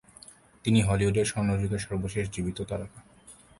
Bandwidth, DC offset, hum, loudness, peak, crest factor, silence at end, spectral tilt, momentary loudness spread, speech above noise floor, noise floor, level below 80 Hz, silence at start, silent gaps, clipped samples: 11.5 kHz; under 0.1%; none; -28 LUFS; -10 dBFS; 18 dB; 0.25 s; -6 dB/octave; 15 LU; 26 dB; -53 dBFS; -46 dBFS; 0.65 s; none; under 0.1%